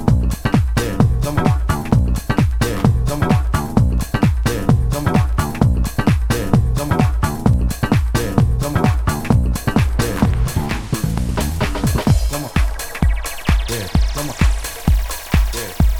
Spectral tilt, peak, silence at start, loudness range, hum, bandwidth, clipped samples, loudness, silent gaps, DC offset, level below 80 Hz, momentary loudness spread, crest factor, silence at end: -6 dB/octave; 0 dBFS; 0 s; 2 LU; none; 20 kHz; under 0.1%; -18 LUFS; none; under 0.1%; -20 dBFS; 4 LU; 16 dB; 0 s